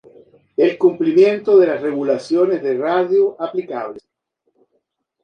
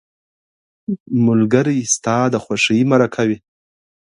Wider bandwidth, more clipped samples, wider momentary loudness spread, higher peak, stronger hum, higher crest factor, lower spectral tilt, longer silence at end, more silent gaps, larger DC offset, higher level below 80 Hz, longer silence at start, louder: second, 8.6 kHz vs 11 kHz; neither; about the same, 12 LU vs 13 LU; about the same, -2 dBFS vs 0 dBFS; neither; about the same, 16 dB vs 18 dB; first, -7 dB/octave vs -5 dB/octave; first, 1.25 s vs 0.7 s; second, none vs 1.00-1.06 s; neither; second, -68 dBFS vs -56 dBFS; second, 0.6 s vs 0.9 s; about the same, -16 LUFS vs -16 LUFS